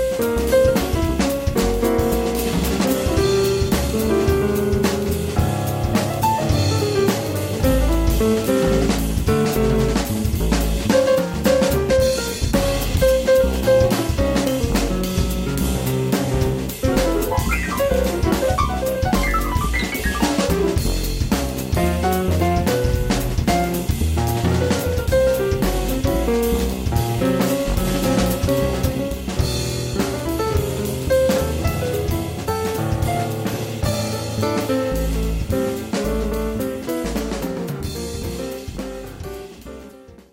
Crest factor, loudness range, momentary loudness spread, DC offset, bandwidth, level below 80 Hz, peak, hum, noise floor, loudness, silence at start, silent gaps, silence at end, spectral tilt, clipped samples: 16 dB; 4 LU; 6 LU; under 0.1%; 16.5 kHz; -26 dBFS; -4 dBFS; none; -42 dBFS; -20 LUFS; 0 s; none; 0.2 s; -5.5 dB/octave; under 0.1%